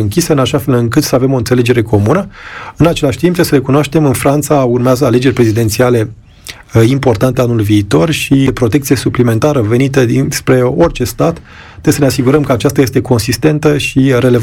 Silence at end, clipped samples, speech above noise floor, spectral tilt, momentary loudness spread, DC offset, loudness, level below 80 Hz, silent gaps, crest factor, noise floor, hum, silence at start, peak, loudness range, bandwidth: 0 s; under 0.1%; 22 dB; -6 dB/octave; 4 LU; 0.1%; -11 LUFS; -34 dBFS; none; 10 dB; -32 dBFS; none; 0 s; 0 dBFS; 1 LU; 17.5 kHz